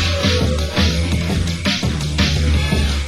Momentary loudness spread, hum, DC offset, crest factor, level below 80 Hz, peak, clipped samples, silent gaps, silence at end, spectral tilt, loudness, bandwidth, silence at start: 3 LU; none; 0.7%; 14 dB; -22 dBFS; -2 dBFS; under 0.1%; none; 0 s; -5 dB/octave; -18 LUFS; 16 kHz; 0 s